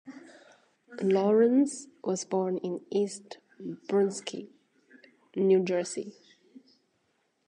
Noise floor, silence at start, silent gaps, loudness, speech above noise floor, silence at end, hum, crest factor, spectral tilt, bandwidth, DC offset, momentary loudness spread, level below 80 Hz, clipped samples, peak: -74 dBFS; 0.05 s; none; -28 LUFS; 46 dB; 1.35 s; none; 18 dB; -5.5 dB/octave; 10.5 kHz; under 0.1%; 20 LU; -86 dBFS; under 0.1%; -14 dBFS